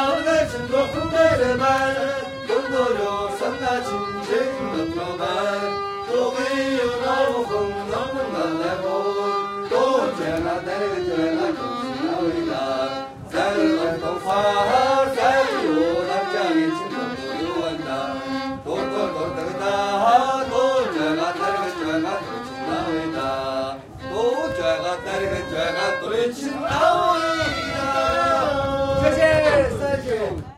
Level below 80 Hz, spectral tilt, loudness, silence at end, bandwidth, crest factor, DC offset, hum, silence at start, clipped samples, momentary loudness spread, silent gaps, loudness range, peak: -46 dBFS; -5 dB/octave; -22 LUFS; 0.05 s; 15 kHz; 18 dB; under 0.1%; none; 0 s; under 0.1%; 8 LU; none; 4 LU; -4 dBFS